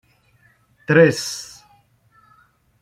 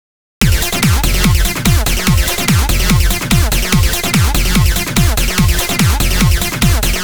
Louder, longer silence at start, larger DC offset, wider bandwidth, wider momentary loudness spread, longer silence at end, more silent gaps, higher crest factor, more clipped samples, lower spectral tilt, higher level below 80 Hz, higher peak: second, -17 LUFS vs -13 LUFS; first, 0.9 s vs 0.4 s; second, under 0.1% vs 4%; second, 15.5 kHz vs over 20 kHz; first, 24 LU vs 1 LU; first, 1.4 s vs 0 s; neither; first, 20 dB vs 12 dB; neither; about the same, -5 dB/octave vs -4 dB/octave; second, -62 dBFS vs -16 dBFS; about the same, -2 dBFS vs 0 dBFS